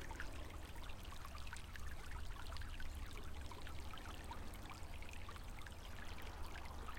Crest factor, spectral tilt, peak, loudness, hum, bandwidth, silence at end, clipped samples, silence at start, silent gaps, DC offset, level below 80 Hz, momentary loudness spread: 16 dB; -4 dB/octave; -32 dBFS; -53 LUFS; none; 16.5 kHz; 0 s; under 0.1%; 0 s; none; under 0.1%; -52 dBFS; 2 LU